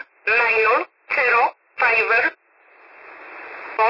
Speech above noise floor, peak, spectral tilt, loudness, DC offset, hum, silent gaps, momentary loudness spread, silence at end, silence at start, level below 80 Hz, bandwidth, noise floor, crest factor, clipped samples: 35 dB; -6 dBFS; -3.5 dB/octave; -18 LUFS; under 0.1%; none; none; 19 LU; 0 s; 0.25 s; -62 dBFS; 5.8 kHz; -53 dBFS; 14 dB; under 0.1%